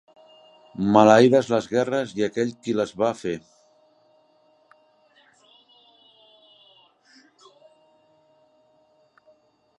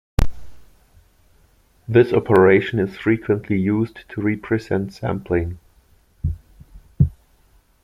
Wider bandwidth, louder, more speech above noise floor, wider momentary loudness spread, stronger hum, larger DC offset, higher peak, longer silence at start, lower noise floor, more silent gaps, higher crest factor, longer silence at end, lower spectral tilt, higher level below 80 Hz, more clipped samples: second, 11 kHz vs 14 kHz; about the same, -21 LUFS vs -20 LUFS; first, 42 dB vs 38 dB; about the same, 16 LU vs 14 LU; neither; neither; about the same, -2 dBFS vs -2 dBFS; first, 0.8 s vs 0.2 s; first, -62 dBFS vs -56 dBFS; neither; about the same, 24 dB vs 20 dB; first, 6.4 s vs 0.7 s; second, -6 dB/octave vs -8.5 dB/octave; second, -66 dBFS vs -34 dBFS; neither